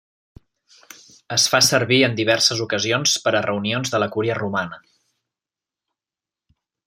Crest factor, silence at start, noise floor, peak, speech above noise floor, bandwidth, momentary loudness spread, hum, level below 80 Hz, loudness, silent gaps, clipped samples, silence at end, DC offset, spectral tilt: 20 dB; 1.3 s; -90 dBFS; -2 dBFS; 70 dB; 16.5 kHz; 9 LU; none; -62 dBFS; -18 LUFS; none; under 0.1%; 2.1 s; under 0.1%; -3 dB/octave